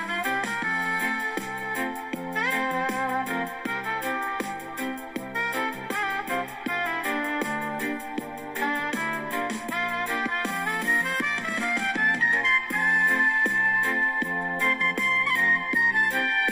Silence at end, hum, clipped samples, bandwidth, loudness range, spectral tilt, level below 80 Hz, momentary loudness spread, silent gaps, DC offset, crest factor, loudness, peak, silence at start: 0 s; none; under 0.1%; 16 kHz; 7 LU; -3 dB/octave; -62 dBFS; 10 LU; none; under 0.1%; 14 dB; -25 LUFS; -12 dBFS; 0 s